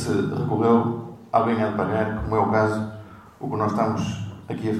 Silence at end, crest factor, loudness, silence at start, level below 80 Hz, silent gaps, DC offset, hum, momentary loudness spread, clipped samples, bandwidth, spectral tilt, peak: 0 s; 18 dB; -23 LUFS; 0 s; -46 dBFS; none; under 0.1%; none; 14 LU; under 0.1%; 12.5 kHz; -7.5 dB/octave; -6 dBFS